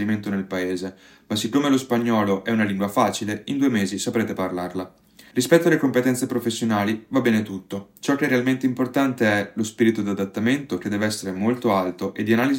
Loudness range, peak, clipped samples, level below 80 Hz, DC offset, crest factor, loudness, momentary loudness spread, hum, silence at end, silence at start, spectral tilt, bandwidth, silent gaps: 1 LU; -2 dBFS; under 0.1%; -66 dBFS; under 0.1%; 20 dB; -22 LUFS; 8 LU; none; 0 s; 0 s; -5 dB/octave; 16.5 kHz; none